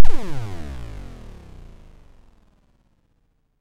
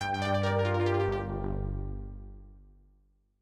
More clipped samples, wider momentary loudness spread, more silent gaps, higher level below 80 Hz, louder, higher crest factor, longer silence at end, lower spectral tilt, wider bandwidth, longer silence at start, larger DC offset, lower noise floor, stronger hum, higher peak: first, 0.2% vs under 0.1%; first, 21 LU vs 17 LU; neither; first, -28 dBFS vs -42 dBFS; second, -34 LUFS vs -31 LUFS; about the same, 16 dB vs 14 dB; first, 2.75 s vs 0.8 s; about the same, -6.5 dB/octave vs -7 dB/octave; second, 4.1 kHz vs 10 kHz; about the same, 0 s vs 0 s; neither; about the same, -65 dBFS vs -67 dBFS; neither; first, 0 dBFS vs -18 dBFS